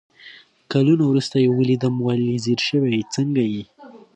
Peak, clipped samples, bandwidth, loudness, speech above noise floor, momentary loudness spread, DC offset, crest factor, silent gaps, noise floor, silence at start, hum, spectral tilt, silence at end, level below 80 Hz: -6 dBFS; under 0.1%; 9.2 kHz; -20 LUFS; 27 dB; 5 LU; under 0.1%; 14 dB; none; -46 dBFS; 0.25 s; none; -6.5 dB/octave; 0.2 s; -62 dBFS